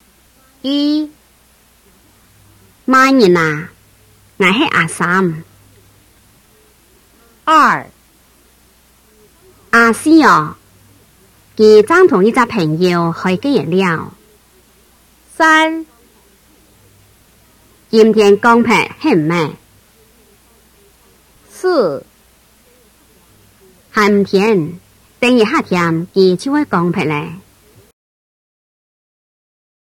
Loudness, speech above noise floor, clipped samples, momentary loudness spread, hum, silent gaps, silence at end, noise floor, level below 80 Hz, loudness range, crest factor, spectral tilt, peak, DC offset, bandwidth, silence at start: -12 LUFS; 39 dB; under 0.1%; 13 LU; none; none; 2.5 s; -50 dBFS; -54 dBFS; 7 LU; 16 dB; -5.5 dB/octave; 0 dBFS; under 0.1%; 17 kHz; 0.65 s